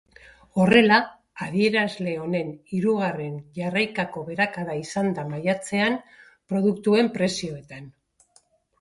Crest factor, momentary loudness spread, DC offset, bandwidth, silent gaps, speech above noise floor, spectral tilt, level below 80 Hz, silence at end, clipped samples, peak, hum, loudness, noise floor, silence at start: 22 dB; 14 LU; under 0.1%; 11.5 kHz; none; 38 dB; -5.5 dB/octave; -62 dBFS; 0.9 s; under 0.1%; -2 dBFS; none; -23 LUFS; -62 dBFS; 0.55 s